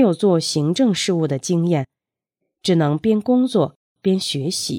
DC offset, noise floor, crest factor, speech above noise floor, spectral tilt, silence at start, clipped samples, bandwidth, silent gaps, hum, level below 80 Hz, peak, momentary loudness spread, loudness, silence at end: under 0.1%; -85 dBFS; 14 dB; 67 dB; -5.5 dB/octave; 0 s; under 0.1%; 16.5 kHz; 3.76-3.96 s; none; -62 dBFS; -4 dBFS; 6 LU; -19 LUFS; 0 s